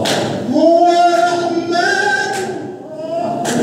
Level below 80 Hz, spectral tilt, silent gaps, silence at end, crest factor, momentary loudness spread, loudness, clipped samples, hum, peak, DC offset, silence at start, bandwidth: -62 dBFS; -4 dB/octave; none; 0 s; 14 dB; 13 LU; -14 LUFS; under 0.1%; none; 0 dBFS; under 0.1%; 0 s; 15 kHz